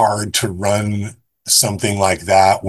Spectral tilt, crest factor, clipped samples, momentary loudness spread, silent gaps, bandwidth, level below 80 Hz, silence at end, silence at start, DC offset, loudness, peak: -3 dB/octave; 16 dB; under 0.1%; 12 LU; none; 13 kHz; -40 dBFS; 0 s; 0 s; under 0.1%; -16 LUFS; 0 dBFS